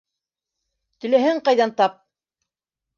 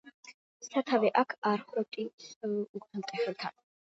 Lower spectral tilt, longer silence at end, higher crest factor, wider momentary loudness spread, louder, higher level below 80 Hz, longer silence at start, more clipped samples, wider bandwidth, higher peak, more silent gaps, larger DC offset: about the same, -4.5 dB/octave vs -5 dB/octave; first, 1.05 s vs 0.45 s; about the same, 18 dB vs 22 dB; second, 4 LU vs 13 LU; first, -19 LUFS vs -33 LUFS; first, -76 dBFS vs -84 dBFS; first, 1.05 s vs 0.05 s; neither; second, 7.2 kHz vs 8 kHz; first, -4 dBFS vs -12 dBFS; second, none vs 0.14-0.23 s, 0.34-0.60 s, 1.38-1.42 s, 2.13-2.18 s, 2.36-2.41 s, 2.69-2.74 s; neither